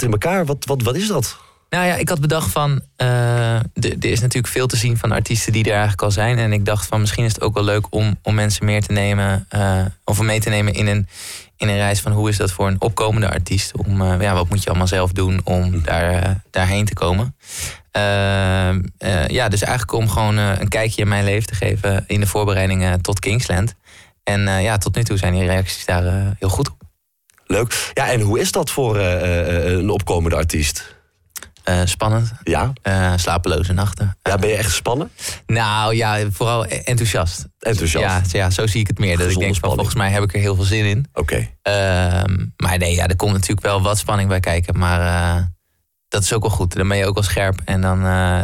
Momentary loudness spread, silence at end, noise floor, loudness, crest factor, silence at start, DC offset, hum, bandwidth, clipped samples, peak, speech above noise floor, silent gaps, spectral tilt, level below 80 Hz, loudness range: 4 LU; 0 s; -69 dBFS; -18 LUFS; 10 dB; 0 s; under 0.1%; none; 16 kHz; under 0.1%; -8 dBFS; 51 dB; none; -5 dB/octave; -34 dBFS; 2 LU